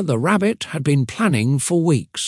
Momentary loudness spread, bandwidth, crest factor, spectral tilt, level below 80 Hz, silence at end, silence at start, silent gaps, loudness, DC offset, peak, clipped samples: 3 LU; 12 kHz; 16 dB; -5.5 dB/octave; -60 dBFS; 0 s; 0 s; none; -19 LUFS; under 0.1%; -2 dBFS; under 0.1%